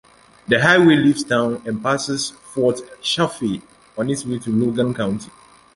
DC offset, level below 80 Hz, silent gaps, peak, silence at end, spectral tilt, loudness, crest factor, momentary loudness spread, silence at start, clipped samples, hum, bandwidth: under 0.1%; -54 dBFS; none; -2 dBFS; 0.5 s; -5 dB/octave; -19 LUFS; 18 dB; 13 LU; 0.5 s; under 0.1%; none; 11.5 kHz